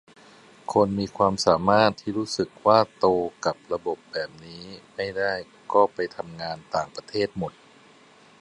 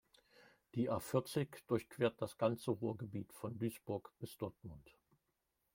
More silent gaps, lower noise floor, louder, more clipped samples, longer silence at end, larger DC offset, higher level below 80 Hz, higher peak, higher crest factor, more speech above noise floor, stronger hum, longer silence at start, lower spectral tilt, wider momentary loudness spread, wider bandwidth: neither; second, -54 dBFS vs -86 dBFS; first, -25 LUFS vs -41 LUFS; neither; about the same, 0.9 s vs 0.85 s; neither; first, -56 dBFS vs -74 dBFS; first, -2 dBFS vs -22 dBFS; about the same, 22 dB vs 22 dB; second, 29 dB vs 45 dB; neither; first, 0.7 s vs 0.4 s; second, -5 dB/octave vs -6.5 dB/octave; first, 14 LU vs 10 LU; second, 11.5 kHz vs 16.5 kHz